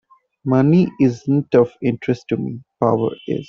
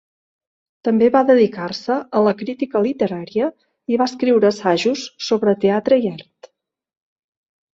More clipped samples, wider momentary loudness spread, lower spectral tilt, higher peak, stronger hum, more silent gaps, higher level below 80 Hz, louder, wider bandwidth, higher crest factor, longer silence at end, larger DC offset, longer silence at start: neither; about the same, 9 LU vs 10 LU; first, -9 dB/octave vs -6 dB/octave; about the same, -2 dBFS vs -2 dBFS; neither; neither; first, -56 dBFS vs -64 dBFS; about the same, -18 LUFS vs -18 LUFS; second, 7 kHz vs 7.8 kHz; about the same, 16 dB vs 16 dB; second, 0.05 s vs 1.55 s; neither; second, 0.45 s vs 0.85 s